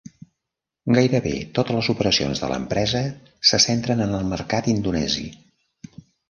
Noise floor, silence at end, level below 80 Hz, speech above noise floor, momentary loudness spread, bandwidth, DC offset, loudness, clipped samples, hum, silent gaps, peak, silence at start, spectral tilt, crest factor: -84 dBFS; 0.95 s; -46 dBFS; 63 dB; 8 LU; 10.5 kHz; under 0.1%; -21 LUFS; under 0.1%; none; none; -2 dBFS; 0.85 s; -4.5 dB/octave; 20 dB